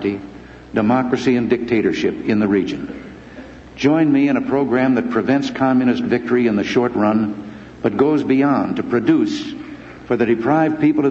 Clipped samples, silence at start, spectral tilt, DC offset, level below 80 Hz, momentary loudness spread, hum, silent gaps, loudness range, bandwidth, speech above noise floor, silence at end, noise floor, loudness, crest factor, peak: under 0.1%; 0 s; -7 dB/octave; under 0.1%; -50 dBFS; 16 LU; none; none; 2 LU; 7.6 kHz; 20 dB; 0 s; -37 dBFS; -17 LUFS; 16 dB; -2 dBFS